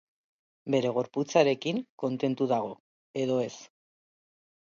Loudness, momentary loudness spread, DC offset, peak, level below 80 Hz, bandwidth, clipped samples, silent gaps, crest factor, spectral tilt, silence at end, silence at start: -29 LUFS; 15 LU; under 0.1%; -8 dBFS; -76 dBFS; 7.4 kHz; under 0.1%; 1.89-1.98 s, 2.80-3.14 s; 22 dB; -5.5 dB/octave; 1 s; 0.65 s